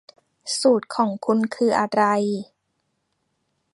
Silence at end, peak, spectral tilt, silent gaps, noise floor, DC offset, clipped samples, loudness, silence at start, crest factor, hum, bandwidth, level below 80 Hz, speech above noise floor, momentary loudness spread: 1.3 s; -4 dBFS; -4.5 dB/octave; none; -73 dBFS; under 0.1%; under 0.1%; -21 LUFS; 0.45 s; 18 dB; none; 11.5 kHz; -70 dBFS; 53 dB; 8 LU